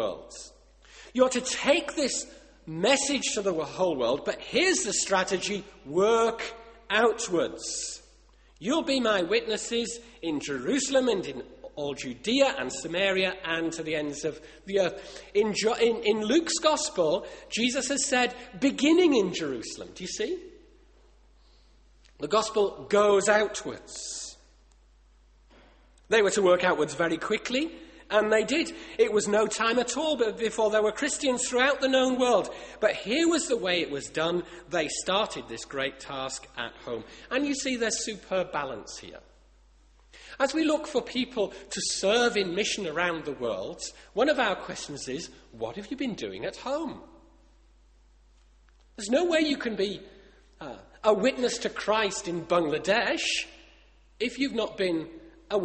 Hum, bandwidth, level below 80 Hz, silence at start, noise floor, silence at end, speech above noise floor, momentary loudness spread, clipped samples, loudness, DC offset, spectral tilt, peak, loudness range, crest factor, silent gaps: none; 8.8 kHz; -58 dBFS; 0 s; -59 dBFS; 0 s; 31 dB; 14 LU; under 0.1%; -27 LUFS; under 0.1%; -3 dB/octave; -6 dBFS; 6 LU; 22 dB; none